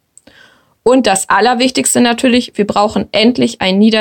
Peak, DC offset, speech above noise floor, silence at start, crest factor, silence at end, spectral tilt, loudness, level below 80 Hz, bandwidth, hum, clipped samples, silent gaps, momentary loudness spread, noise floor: 0 dBFS; under 0.1%; 36 dB; 0.85 s; 12 dB; 0 s; -3.5 dB/octave; -11 LUFS; -48 dBFS; 17 kHz; none; under 0.1%; none; 4 LU; -47 dBFS